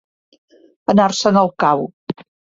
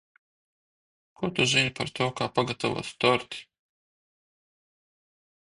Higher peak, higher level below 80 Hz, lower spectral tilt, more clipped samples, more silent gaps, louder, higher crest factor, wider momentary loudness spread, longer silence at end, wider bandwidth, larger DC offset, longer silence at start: first, -2 dBFS vs -8 dBFS; about the same, -58 dBFS vs -62 dBFS; first, -5.5 dB/octave vs -4 dB/octave; neither; first, 1.93-2.07 s vs none; first, -16 LUFS vs -26 LUFS; second, 16 dB vs 24 dB; first, 16 LU vs 11 LU; second, 0.4 s vs 2.05 s; second, 7.8 kHz vs 11.5 kHz; neither; second, 0.9 s vs 1.2 s